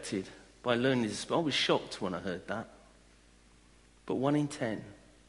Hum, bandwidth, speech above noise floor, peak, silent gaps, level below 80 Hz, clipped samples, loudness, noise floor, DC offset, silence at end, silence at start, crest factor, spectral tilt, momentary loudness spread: 60 Hz at -60 dBFS; 11.5 kHz; 29 dB; -14 dBFS; none; -64 dBFS; under 0.1%; -33 LUFS; -61 dBFS; under 0.1%; 0.35 s; 0 s; 20 dB; -5 dB/octave; 12 LU